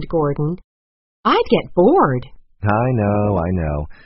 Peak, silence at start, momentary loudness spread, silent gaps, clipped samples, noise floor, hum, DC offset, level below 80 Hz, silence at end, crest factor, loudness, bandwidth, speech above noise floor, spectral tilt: -2 dBFS; 0 s; 10 LU; 0.64-1.23 s; under 0.1%; under -90 dBFS; none; under 0.1%; -36 dBFS; 0.1 s; 16 dB; -18 LUFS; 5.8 kHz; over 73 dB; -6.5 dB/octave